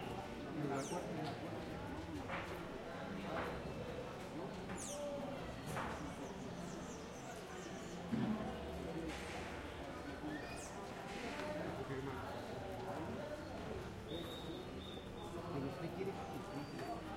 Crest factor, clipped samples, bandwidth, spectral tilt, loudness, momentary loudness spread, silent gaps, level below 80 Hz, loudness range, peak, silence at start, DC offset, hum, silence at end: 18 dB; under 0.1%; 16.5 kHz; -5 dB/octave; -46 LUFS; 5 LU; none; -60 dBFS; 1 LU; -28 dBFS; 0 s; under 0.1%; none; 0 s